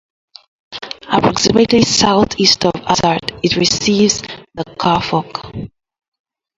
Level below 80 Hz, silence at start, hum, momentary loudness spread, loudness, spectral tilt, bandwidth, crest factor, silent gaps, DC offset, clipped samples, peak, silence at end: -42 dBFS; 0.7 s; none; 18 LU; -13 LUFS; -3.5 dB/octave; 8 kHz; 16 dB; none; under 0.1%; under 0.1%; 0 dBFS; 0.9 s